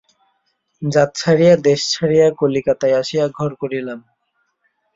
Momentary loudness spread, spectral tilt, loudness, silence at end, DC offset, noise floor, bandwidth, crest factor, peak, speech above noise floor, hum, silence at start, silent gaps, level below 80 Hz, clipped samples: 13 LU; -5.5 dB/octave; -16 LUFS; 0.95 s; under 0.1%; -68 dBFS; 7.8 kHz; 16 dB; -2 dBFS; 53 dB; none; 0.8 s; none; -56 dBFS; under 0.1%